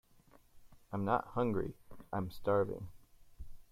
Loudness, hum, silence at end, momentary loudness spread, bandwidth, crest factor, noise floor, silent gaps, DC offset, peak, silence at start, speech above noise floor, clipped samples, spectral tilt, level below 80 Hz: -37 LUFS; none; 0.1 s; 24 LU; 16 kHz; 22 dB; -64 dBFS; none; under 0.1%; -18 dBFS; 0.55 s; 29 dB; under 0.1%; -8.5 dB/octave; -58 dBFS